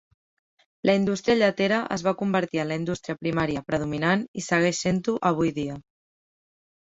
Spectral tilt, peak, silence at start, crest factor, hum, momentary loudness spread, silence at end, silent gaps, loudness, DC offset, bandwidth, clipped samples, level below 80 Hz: -5.5 dB/octave; -6 dBFS; 0.85 s; 20 dB; none; 7 LU; 1.05 s; 4.28-4.34 s; -25 LUFS; under 0.1%; 8 kHz; under 0.1%; -56 dBFS